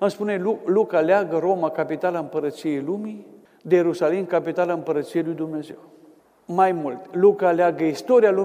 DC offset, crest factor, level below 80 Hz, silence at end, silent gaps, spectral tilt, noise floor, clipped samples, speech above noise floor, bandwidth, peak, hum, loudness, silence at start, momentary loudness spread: under 0.1%; 16 dB; -74 dBFS; 0 s; none; -7 dB/octave; -53 dBFS; under 0.1%; 32 dB; 15 kHz; -4 dBFS; none; -22 LUFS; 0 s; 11 LU